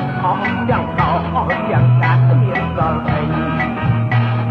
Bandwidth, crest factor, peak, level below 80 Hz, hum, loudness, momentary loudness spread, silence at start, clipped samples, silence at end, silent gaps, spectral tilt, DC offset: 4.8 kHz; 12 dB; -2 dBFS; -36 dBFS; none; -16 LUFS; 5 LU; 0 s; under 0.1%; 0 s; none; -9.5 dB/octave; under 0.1%